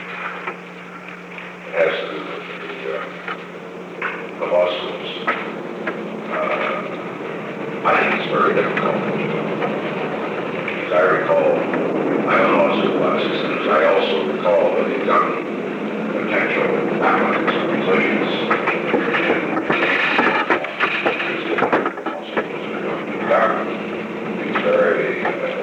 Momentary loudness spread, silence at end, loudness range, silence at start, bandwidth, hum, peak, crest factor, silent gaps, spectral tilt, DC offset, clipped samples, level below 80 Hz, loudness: 12 LU; 0 s; 7 LU; 0 s; 9.2 kHz; none; -2 dBFS; 18 dB; none; -6.5 dB/octave; under 0.1%; under 0.1%; -64 dBFS; -19 LUFS